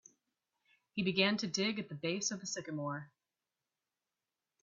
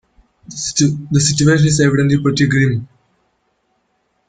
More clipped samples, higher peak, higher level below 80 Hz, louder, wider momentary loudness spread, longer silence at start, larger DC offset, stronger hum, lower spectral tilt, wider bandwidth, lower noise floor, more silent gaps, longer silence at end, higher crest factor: neither; second, -16 dBFS vs -2 dBFS; second, -78 dBFS vs -46 dBFS; second, -36 LUFS vs -14 LUFS; about the same, 10 LU vs 10 LU; first, 0.95 s vs 0.5 s; neither; neither; second, -3 dB/octave vs -5 dB/octave; second, 7.8 kHz vs 9.4 kHz; first, under -90 dBFS vs -65 dBFS; neither; about the same, 1.55 s vs 1.45 s; first, 24 dB vs 14 dB